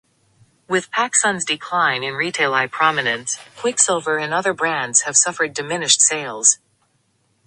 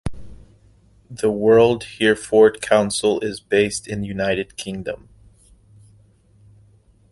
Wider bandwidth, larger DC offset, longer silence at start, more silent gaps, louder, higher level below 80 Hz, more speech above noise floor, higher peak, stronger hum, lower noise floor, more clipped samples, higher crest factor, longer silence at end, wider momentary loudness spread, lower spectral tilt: about the same, 11.5 kHz vs 11.5 kHz; neither; first, 0.7 s vs 0.05 s; neither; about the same, -17 LUFS vs -19 LUFS; second, -66 dBFS vs -46 dBFS; first, 45 dB vs 35 dB; about the same, 0 dBFS vs -2 dBFS; neither; first, -64 dBFS vs -54 dBFS; neither; about the same, 20 dB vs 20 dB; second, 0.9 s vs 2.15 s; second, 9 LU vs 15 LU; second, -0.5 dB/octave vs -4.5 dB/octave